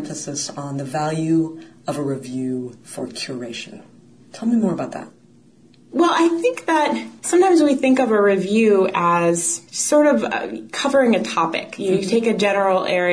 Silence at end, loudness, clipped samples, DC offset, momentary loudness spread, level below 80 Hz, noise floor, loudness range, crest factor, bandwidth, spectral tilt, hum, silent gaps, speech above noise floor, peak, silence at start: 0 s; -19 LUFS; under 0.1%; 0.1%; 13 LU; -64 dBFS; -51 dBFS; 9 LU; 14 dB; 11 kHz; -4.5 dB/octave; none; none; 32 dB; -6 dBFS; 0 s